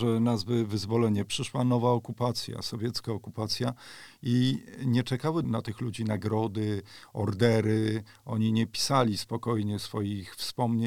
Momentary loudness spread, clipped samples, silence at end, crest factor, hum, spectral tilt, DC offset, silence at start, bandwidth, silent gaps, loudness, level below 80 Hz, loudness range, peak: 9 LU; under 0.1%; 0 s; 20 dB; none; -6 dB/octave; 0.2%; 0 s; 16 kHz; none; -29 LUFS; -62 dBFS; 2 LU; -10 dBFS